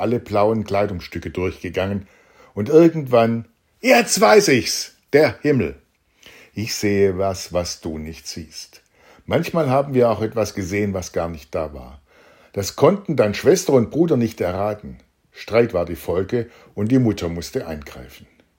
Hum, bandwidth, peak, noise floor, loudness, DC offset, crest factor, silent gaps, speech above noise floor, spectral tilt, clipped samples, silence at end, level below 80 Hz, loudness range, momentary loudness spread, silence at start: none; 16.5 kHz; 0 dBFS; -51 dBFS; -19 LUFS; under 0.1%; 20 dB; none; 32 dB; -5 dB/octave; under 0.1%; 0.4 s; -50 dBFS; 6 LU; 17 LU; 0 s